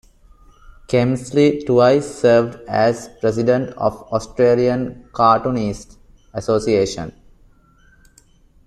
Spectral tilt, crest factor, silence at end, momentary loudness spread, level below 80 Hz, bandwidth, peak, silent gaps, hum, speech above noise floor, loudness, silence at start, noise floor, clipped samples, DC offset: -6.5 dB/octave; 18 dB; 1.55 s; 11 LU; -46 dBFS; 12 kHz; -2 dBFS; none; none; 35 dB; -18 LUFS; 0.9 s; -52 dBFS; under 0.1%; under 0.1%